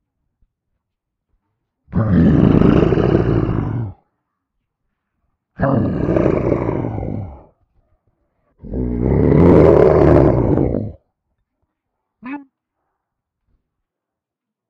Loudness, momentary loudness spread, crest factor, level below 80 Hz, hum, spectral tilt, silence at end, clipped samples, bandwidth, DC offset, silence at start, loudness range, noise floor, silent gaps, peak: -15 LUFS; 19 LU; 18 dB; -30 dBFS; none; -10.5 dB/octave; 2.3 s; under 0.1%; 6.2 kHz; under 0.1%; 1.9 s; 8 LU; -83 dBFS; none; 0 dBFS